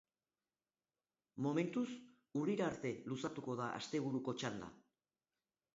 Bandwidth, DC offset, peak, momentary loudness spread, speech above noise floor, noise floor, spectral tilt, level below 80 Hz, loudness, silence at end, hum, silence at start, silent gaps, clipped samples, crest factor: 7.6 kHz; under 0.1%; -24 dBFS; 9 LU; over 49 dB; under -90 dBFS; -5.5 dB/octave; -78 dBFS; -42 LUFS; 0.95 s; none; 1.35 s; none; under 0.1%; 18 dB